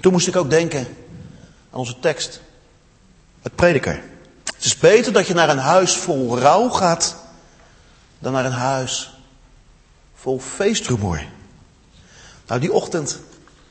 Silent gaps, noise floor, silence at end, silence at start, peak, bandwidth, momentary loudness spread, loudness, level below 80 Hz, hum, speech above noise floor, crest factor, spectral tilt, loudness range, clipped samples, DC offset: none; -52 dBFS; 0.5 s; 0 s; 0 dBFS; 8.8 kHz; 18 LU; -18 LUFS; -46 dBFS; none; 34 dB; 20 dB; -4 dB/octave; 10 LU; under 0.1%; under 0.1%